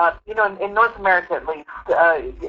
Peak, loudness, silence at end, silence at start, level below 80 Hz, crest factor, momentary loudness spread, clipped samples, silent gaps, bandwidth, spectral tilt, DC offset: -4 dBFS; -19 LUFS; 0 s; 0 s; -46 dBFS; 16 dB; 10 LU; under 0.1%; none; 6.8 kHz; -6 dB/octave; under 0.1%